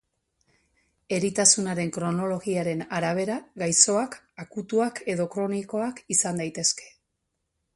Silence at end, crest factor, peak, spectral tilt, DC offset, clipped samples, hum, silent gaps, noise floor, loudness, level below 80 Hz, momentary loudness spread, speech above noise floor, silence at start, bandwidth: 0.85 s; 24 dB; -2 dBFS; -3 dB/octave; under 0.1%; under 0.1%; none; none; -79 dBFS; -25 LUFS; -66 dBFS; 12 LU; 53 dB; 1.1 s; 11.5 kHz